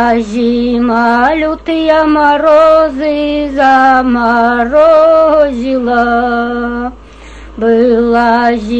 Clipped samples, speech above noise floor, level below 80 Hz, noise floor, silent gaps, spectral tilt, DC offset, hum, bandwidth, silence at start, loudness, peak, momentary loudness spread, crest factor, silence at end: under 0.1%; 22 dB; -34 dBFS; -31 dBFS; none; -6 dB/octave; 0.4%; none; 8.4 kHz; 0 s; -9 LUFS; 0 dBFS; 8 LU; 10 dB; 0 s